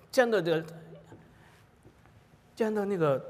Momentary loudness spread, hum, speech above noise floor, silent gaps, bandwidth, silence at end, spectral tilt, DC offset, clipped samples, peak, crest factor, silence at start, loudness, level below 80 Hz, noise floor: 24 LU; none; 31 dB; none; 15.5 kHz; 0 s; -6 dB/octave; under 0.1%; under 0.1%; -12 dBFS; 20 dB; 0.15 s; -29 LUFS; -70 dBFS; -59 dBFS